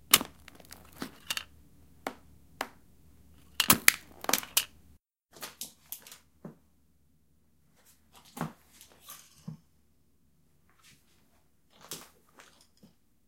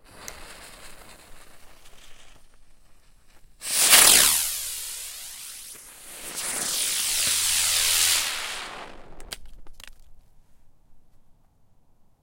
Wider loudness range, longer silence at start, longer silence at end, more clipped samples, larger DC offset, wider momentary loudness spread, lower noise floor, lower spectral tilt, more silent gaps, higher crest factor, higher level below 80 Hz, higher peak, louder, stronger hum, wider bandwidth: first, 23 LU vs 8 LU; about the same, 0.1 s vs 0.15 s; about the same, 1.25 s vs 1.25 s; neither; neither; about the same, 28 LU vs 27 LU; first, -70 dBFS vs -57 dBFS; first, -1 dB/octave vs 1.5 dB/octave; neither; first, 36 dB vs 26 dB; second, -64 dBFS vs -50 dBFS; about the same, 0 dBFS vs 0 dBFS; second, -29 LUFS vs -19 LUFS; neither; about the same, 17 kHz vs 16 kHz